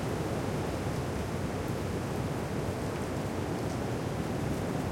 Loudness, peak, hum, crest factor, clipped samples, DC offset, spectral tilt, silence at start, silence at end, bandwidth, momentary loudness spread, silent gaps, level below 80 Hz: -34 LUFS; -20 dBFS; none; 12 dB; under 0.1%; under 0.1%; -6 dB/octave; 0 s; 0 s; 16.5 kHz; 1 LU; none; -48 dBFS